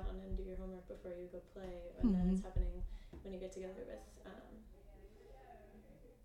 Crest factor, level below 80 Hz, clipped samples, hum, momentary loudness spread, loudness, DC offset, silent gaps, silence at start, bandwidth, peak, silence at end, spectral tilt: 20 dB; -48 dBFS; under 0.1%; none; 25 LU; -44 LUFS; under 0.1%; none; 0 s; 10.5 kHz; -22 dBFS; 0 s; -8.5 dB/octave